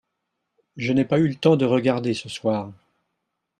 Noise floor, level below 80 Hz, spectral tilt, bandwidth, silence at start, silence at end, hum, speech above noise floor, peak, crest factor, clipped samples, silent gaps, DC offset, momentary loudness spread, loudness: -78 dBFS; -62 dBFS; -7 dB/octave; 11 kHz; 0.75 s; 0.85 s; none; 57 dB; -4 dBFS; 20 dB; under 0.1%; none; under 0.1%; 9 LU; -22 LUFS